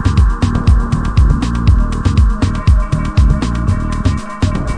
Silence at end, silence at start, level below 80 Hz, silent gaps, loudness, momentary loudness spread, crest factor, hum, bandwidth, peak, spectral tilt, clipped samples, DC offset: 0 s; 0 s; -14 dBFS; none; -14 LUFS; 4 LU; 12 dB; none; 10.5 kHz; 0 dBFS; -7 dB/octave; 0.3%; under 0.1%